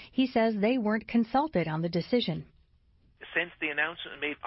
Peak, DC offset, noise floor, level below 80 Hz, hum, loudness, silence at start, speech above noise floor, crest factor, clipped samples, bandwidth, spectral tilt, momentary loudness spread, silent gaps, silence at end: -14 dBFS; under 0.1%; -64 dBFS; -62 dBFS; none; -29 LUFS; 0 s; 35 dB; 16 dB; under 0.1%; 5.8 kHz; -9.5 dB/octave; 7 LU; none; 0 s